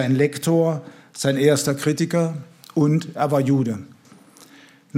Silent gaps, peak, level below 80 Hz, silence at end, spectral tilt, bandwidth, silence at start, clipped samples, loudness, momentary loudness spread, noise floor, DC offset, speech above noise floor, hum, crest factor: none; -4 dBFS; -66 dBFS; 0 s; -6 dB/octave; 16.5 kHz; 0 s; under 0.1%; -21 LUFS; 11 LU; -49 dBFS; under 0.1%; 30 dB; none; 16 dB